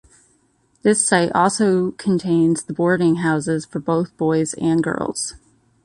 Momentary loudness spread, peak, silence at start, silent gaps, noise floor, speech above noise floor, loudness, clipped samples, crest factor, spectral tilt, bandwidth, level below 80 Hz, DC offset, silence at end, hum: 7 LU; -4 dBFS; 0.85 s; none; -61 dBFS; 43 dB; -19 LUFS; under 0.1%; 16 dB; -5 dB/octave; 11.5 kHz; -56 dBFS; under 0.1%; 0.5 s; none